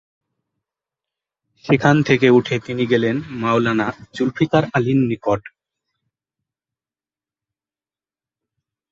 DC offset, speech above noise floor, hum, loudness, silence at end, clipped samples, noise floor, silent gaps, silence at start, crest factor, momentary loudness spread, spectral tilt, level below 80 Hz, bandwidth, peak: under 0.1%; over 73 dB; none; -18 LUFS; 3.45 s; under 0.1%; under -90 dBFS; none; 1.65 s; 20 dB; 9 LU; -7 dB/octave; -54 dBFS; 7.6 kHz; -2 dBFS